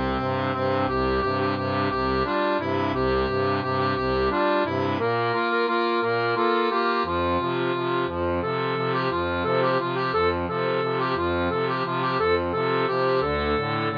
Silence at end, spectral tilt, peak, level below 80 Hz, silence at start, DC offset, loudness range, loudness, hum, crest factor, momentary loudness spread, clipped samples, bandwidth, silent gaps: 0 s; -8 dB/octave; -10 dBFS; -44 dBFS; 0 s; under 0.1%; 1 LU; -24 LUFS; none; 14 dB; 3 LU; under 0.1%; 5.2 kHz; none